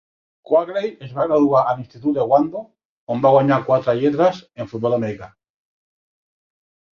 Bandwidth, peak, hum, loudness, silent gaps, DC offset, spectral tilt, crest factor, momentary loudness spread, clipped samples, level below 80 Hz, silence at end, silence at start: 7 kHz; -2 dBFS; none; -19 LUFS; 2.85-3.07 s; under 0.1%; -8.5 dB/octave; 18 dB; 12 LU; under 0.1%; -60 dBFS; 1.65 s; 0.5 s